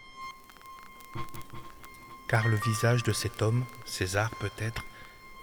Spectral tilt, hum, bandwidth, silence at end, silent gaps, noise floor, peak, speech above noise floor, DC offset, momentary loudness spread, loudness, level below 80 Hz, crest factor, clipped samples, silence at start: -5 dB/octave; none; over 20 kHz; 0 s; none; -49 dBFS; -12 dBFS; 20 dB; under 0.1%; 22 LU; -30 LUFS; -54 dBFS; 20 dB; under 0.1%; 0 s